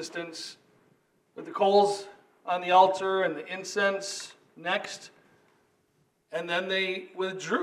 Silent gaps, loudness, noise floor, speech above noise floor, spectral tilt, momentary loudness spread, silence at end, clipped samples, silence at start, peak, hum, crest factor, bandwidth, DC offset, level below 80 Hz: none; -27 LUFS; -70 dBFS; 43 dB; -3 dB/octave; 19 LU; 0 s; under 0.1%; 0 s; -6 dBFS; none; 22 dB; 13 kHz; under 0.1%; -88 dBFS